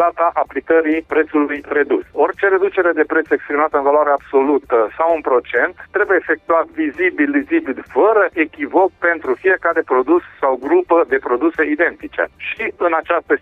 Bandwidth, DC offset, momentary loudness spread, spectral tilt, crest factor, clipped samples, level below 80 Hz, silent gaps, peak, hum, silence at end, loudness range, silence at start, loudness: 4 kHz; under 0.1%; 5 LU; -7 dB/octave; 12 dB; under 0.1%; -54 dBFS; none; -4 dBFS; none; 0.05 s; 1 LU; 0 s; -16 LUFS